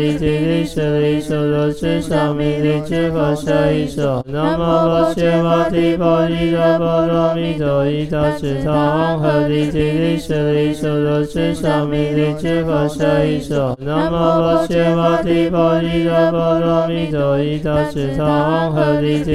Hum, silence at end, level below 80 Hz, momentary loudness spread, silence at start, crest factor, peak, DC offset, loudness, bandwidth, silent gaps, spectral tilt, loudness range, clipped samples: none; 0 s; -36 dBFS; 4 LU; 0 s; 14 dB; -2 dBFS; under 0.1%; -16 LUFS; 13.5 kHz; none; -7.5 dB/octave; 2 LU; under 0.1%